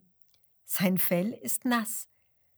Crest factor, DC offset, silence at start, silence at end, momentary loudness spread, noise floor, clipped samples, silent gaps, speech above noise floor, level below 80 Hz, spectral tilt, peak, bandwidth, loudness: 20 dB; under 0.1%; 0.7 s; 0.55 s; 10 LU; -64 dBFS; under 0.1%; none; 36 dB; -80 dBFS; -4.5 dB/octave; -12 dBFS; over 20 kHz; -28 LUFS